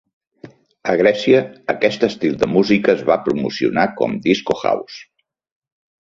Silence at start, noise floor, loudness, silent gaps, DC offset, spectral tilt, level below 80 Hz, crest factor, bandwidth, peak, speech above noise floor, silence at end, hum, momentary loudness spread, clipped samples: 0.45 s; -43 dBFS; -17 LUFS; none; under 0.1%; -6 dB/octave; -54 dBFS; 18 dB; 7.6 kHz; -2 dBFS; 26 dB; 1 s; none; 8 LU; under 0.1%